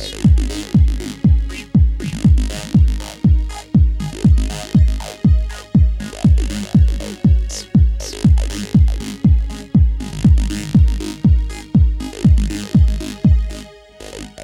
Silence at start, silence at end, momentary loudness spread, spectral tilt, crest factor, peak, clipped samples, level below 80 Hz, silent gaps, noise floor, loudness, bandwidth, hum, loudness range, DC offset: 0 s; 0 s; 4 LU; -7 dB/octave; 12 dB; -2 dBFS; under 0.1%; -18 dBFS; none; -37 dBFS; -16 LUFS; 12 kHz; none; 0 LU; under 0.1%